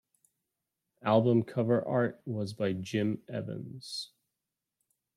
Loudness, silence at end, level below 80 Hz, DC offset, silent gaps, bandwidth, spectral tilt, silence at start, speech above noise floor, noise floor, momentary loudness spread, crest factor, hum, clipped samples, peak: -31 LUFS; 1.1 s; -74 dBFS; under 0.1%; none; 12.5 kHz; -7 dB/octave; 1.05 s; 58 dB; -88 dBFS; 13 LU; 20 dB; none; under 0.1%; -12 dBFS